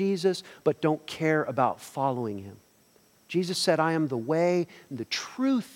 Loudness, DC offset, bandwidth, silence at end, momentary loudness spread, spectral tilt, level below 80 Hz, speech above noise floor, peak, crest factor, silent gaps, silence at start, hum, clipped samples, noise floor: -28 LUFS; under 0.1%; 17 kHz; 0 s; 9 LU; -5.5 dB/octave; -74 dBFS; 34 dB; -10 dBFS; 18 dB; none; 0 s; none; under 0.1%; -62 dBFS